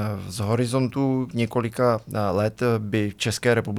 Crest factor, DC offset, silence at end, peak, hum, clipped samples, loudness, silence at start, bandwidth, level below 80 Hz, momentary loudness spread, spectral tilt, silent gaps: 16 dB; under 0.1%; 0 s; -6 dBFS; none; under 0.1%; -24 LUFS; 0 s; 15 kHz; -56 dBFS; 3 LU; -6 dB/octave; none